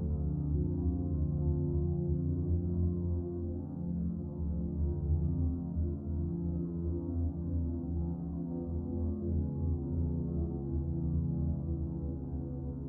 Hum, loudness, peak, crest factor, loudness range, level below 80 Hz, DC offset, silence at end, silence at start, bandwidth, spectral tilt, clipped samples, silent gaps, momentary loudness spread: none; -35 LUFS; -20 dBFS; 12 dB; 3 LU; -40 dBFS; under 0.1%; 0 s; 0 s; 1.5 kHz; -16 dB/octave; under 0.1%; none; 5 LU